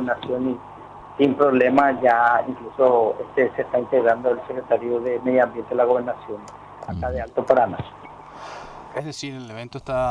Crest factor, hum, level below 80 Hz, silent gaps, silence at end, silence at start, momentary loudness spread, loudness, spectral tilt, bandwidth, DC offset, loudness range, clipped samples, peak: 18 dB; none; -48 dBFS; none; 0 s; 0 s; 20 LU; -21 LUFS; -6.5 dB/octave; 10.5 kHz; under 0.1%; 7 LU; under 0.1%; -4 dBFS